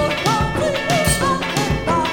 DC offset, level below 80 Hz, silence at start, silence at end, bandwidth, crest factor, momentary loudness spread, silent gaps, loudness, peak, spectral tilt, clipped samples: under 0.1%; -32 dBFS; 0 s; 0 s; 19 kHz; 14 dB; 3 LU; none; -18 LUFS; -4 dBFS; -4 dB/octave; under 0.1%